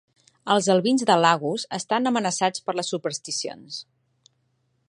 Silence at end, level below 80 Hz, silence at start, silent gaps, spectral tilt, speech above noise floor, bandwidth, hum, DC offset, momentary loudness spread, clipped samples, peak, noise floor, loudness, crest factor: 1.05 s; -74 dBFS; 0.45 s; none; -3.5 dB/octave; 47 dB; 11.5 kHz; none; under 0.1%; 15 LU; under 0.1%; -4 dBFS; -70 dBFS; -23 LUFS; 20 dB